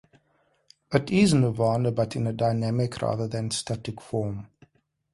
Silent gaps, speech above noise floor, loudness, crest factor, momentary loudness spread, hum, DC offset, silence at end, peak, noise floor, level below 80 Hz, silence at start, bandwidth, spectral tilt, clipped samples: none; 43 dB; -26 LUFS; 20 dB; 11 LU; none; under 0.1%; 0.7 s; -6 dBFS; -68 dBFS; -54 dBFS; 0.9 s; 11.5 kHz; -6 dB/octave; under 0.1%